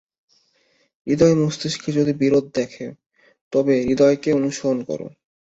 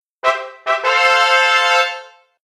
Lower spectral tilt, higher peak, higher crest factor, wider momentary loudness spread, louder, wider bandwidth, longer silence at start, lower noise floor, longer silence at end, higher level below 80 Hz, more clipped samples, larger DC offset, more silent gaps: first, -6 dB/octave vs 2 dB/octave; about the same, -2 dBFS vs 0 dBFS; about the same, 18 dB vs 16 dB; first, 14 LU vs 9 LU; second, -20 LUFS vs -14 LUFS; second, 8.2 kHz vs 14.5 kHz; first, 1.05 s vs 0.25 s; first, -63 dBFS vs -35 dBFS; about the same, 0.35 s vs 0.4 s; first, -54 dBFS vs -66 dBFS; neither; neither; first, 3.06-3.10 s, 3.41-3.51 s vs none